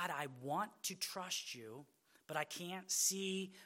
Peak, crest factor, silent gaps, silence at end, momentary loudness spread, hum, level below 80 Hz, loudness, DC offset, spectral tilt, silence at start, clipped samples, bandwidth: -22 dBFS; 20 dB; none; 0 s; 13 LU; none; under -90 dBFS; -41 LUFS; under 0.1%; -2 dB/octave; 0 s; under 0.1%; 16.5 kHz